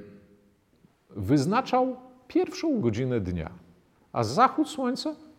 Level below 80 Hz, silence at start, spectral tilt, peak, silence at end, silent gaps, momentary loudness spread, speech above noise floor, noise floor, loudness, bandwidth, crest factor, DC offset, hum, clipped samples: -56 dBFS; 0 s; -6.5 dB/octave; -8 dBFS; 0.15 s; none; 13 LU; 37 dB; -63 dBFS; -27 LUFS; 15 kHz; 20 dB; under 0.1%; none; under 0.1%